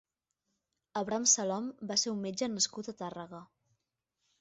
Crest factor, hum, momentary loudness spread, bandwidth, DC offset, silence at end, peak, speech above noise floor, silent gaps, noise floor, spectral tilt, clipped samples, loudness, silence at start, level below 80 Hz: 24 dB; none; 17 LU; 8 kHz; under 0.1%; 0.95 s; -12 dBFS; 51 dB; none; -85 dBFS; -3 dB/octave; under 0.1%; -32 LUFS; 0.95 s; -76 dBFS